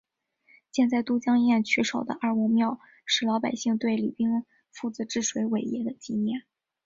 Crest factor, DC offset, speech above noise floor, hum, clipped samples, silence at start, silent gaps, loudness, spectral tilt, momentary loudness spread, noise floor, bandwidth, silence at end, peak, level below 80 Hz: 16 dB; under 0.1%; 39 dB; none; under 0.1%; 0.75 s; none; -27 LUFS; -4 dB/octave; 10 LU; -65 dBFS; 7.6 kHz; 0.45 s; -10 dBFS; -70 dBFS